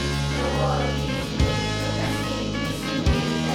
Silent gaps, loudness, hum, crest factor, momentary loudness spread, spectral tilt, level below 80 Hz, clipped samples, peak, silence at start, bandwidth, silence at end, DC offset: none; -24 LUFS; none; 14 dB; 4 LU; -5 dB/octave; -32 dBFS; under 0.1%; -10 dBFS; 0 s; 16.5 kHz; 0 s; under 0.1%